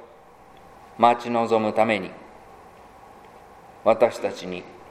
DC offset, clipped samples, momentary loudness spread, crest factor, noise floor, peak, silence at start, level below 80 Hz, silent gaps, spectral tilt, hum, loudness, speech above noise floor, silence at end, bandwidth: under 0.1%; under 0.1%; 16 LU; 22 dB; -49 dBFS; -2 dBFS; 0 s; -62 dBFS; none; -5.5 dB/octave; none; -22 LUFS; 28 dB; 0.15 s; 14.5 kHz